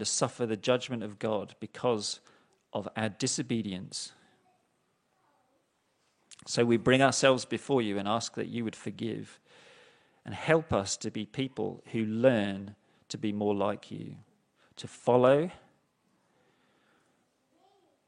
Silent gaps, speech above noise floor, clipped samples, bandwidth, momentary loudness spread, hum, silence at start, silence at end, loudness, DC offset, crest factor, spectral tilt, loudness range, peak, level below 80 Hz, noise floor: none; 45 dB; under 0.1%; 11 kHz; 18 LU; none; 0 s; 2.5 s; -30 LUFS; under 0.1%; 24 dB; -4.5 dB/octave; 8 LU; -8 dBFS; -70 dBFS; -74 dBFS